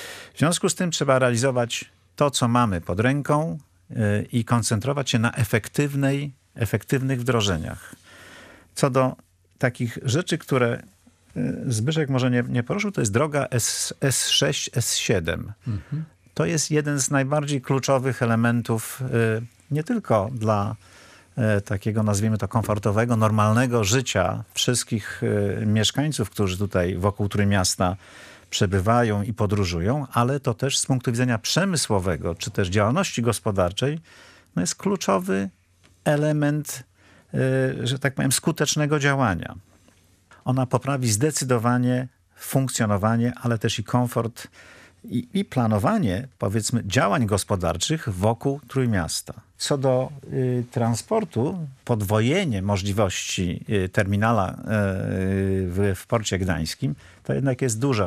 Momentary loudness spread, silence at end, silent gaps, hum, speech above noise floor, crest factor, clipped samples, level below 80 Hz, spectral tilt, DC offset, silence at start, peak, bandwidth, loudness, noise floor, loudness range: 8 LU; 0 s; none; none; 35 dB; 20 dB; under 0.1%; -56 dBFS; -5 dB/octave; under 0.1%; 0 s; -2 dBFS; 15.5 kHz; -23 LUFS; -57 dBFS; 3 LU